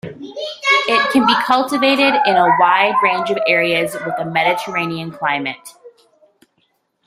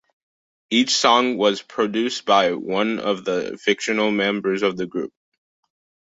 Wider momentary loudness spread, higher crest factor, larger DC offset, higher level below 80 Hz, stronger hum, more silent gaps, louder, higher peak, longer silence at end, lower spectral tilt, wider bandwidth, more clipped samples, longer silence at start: first, 11 LU vs 8 LU; about the same, 16 dB vs 20 dB; neither; about the same, -62 dBFS vs -66 dBFS; neither; neither; first, -15 LUFS vs -20 LUFS; about the same, 0 dBFS vs -2 dBFS; about the same, 1.15 s vs 1.05 s; about the same, -4 dB/octave vs -3.5 dB/octave; first, 16 kHz vs 8 kHz; neither; second, 0.05 s vs 0.7 s